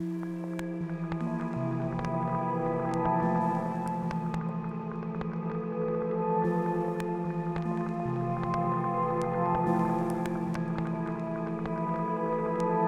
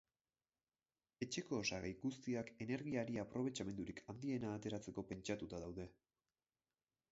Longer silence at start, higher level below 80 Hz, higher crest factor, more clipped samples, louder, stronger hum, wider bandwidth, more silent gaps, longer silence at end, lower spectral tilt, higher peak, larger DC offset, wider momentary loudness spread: second, 0 s vs 1.2 s; first, -56 dBFS vs -70 dBFS; second, 14 dB vs 20 dB; neither; first, -31 LUFS vs -46 LUFS; neither; first, 10.5 kHz vs 7.6 kHz; neither; second, 0 s vs 1.2 s; first, -9 dB/octave vs -5 dB/octave; first, -16 dBFS vs -28 dBFS; first, 0.1% vs under 0.1%; about the same, 7 LU vs 7 LU